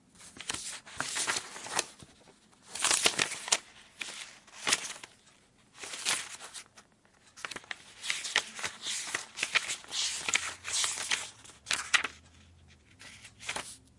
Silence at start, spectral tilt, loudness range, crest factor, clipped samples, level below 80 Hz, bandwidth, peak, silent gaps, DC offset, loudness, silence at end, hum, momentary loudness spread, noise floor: 0.15 s; 1 dB/octave; 5 LU; 28 dB; under 0.1%; -70 dBFS; 11.5 kHz; -8 dBFS; none; under 0.1%; -32 LUFS; 0.2 s; none; 18 LU; -63 dBFS